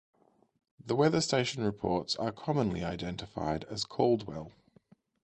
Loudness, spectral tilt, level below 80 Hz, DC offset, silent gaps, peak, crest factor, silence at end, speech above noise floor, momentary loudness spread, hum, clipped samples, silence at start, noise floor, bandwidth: -32 LUFS; -5 dB/octave; -56 dBFS; under 0.1%; none; -12 dBFS; 20 dB; 0.75 s; 33 dB; 11 LU; none; under 0.1%; 0.8 s; -64 dBFS; 9.6 kHz